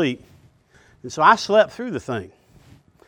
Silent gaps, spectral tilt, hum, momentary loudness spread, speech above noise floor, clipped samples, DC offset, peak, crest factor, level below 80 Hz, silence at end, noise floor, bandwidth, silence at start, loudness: none; -4.5 dB/octave; none; 19 LU; 35 dB; under 0.1%; under 0.1%; 0 dBFS; 22 dB; -60 dBFS; 0.8 s; -55 dBFS; 10.5 kHz; 0 s; -19 LUFS